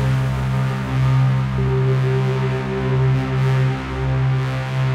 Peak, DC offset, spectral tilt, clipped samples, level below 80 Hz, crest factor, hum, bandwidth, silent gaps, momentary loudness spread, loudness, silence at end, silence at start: -8 dBFS; under 0.1%; -8 dB/octave; under 0.1%; -34 dBFS; 10 dB; none; 7.6 kHz; none; 4 LU; -19 LUFS; 0 s; 0 s